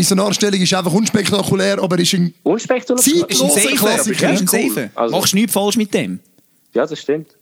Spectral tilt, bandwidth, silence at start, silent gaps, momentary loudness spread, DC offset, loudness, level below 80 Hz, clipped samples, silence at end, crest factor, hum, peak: -3.5 dB/octave; over 20 kHz; 0 s; none; 8 LU; under 0.1%; -15 LUFS; -58 dBFS; under 0.1%; 0.15 s; 14 dB; none; -2 dBFS